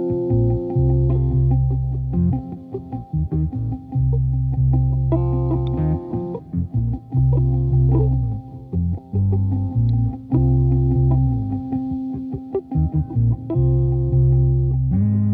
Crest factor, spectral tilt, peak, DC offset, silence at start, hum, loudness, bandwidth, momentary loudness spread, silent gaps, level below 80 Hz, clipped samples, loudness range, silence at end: 12 dB; -13.5 dB/octave; -6 dBFS; under 0.1%; 0 s; none; -20 LUFS; 1.4 kHz; 9 LU; none; -28 dBFS; under 0.1%; 2 LU; 0 s